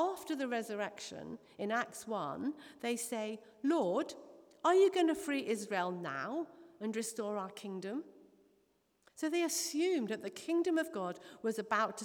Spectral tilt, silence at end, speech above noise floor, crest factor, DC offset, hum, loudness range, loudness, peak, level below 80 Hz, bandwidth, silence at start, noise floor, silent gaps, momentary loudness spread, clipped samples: -3.5 dB/octave; 0 s; 39 dB; 18 dB; under 0.1%; none; 7 LU; -36 LUFS; -18 dBFS; -84 dBFS; over 20 kHz; 0 s; -75 dBFS; none; 11 LU; under 0.1%